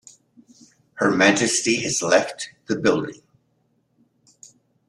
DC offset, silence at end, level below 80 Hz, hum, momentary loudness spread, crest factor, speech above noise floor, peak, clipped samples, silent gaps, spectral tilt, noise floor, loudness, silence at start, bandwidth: under 0.1%; 1.75 s; -62 dBFS; none; 13 LU; 22 dB; 47 dB; -2 dBFS; under 0.1%; none; -3 dB/octave; -67 dBFS; -20 LUFS; 0.95 s; 12.5 kHz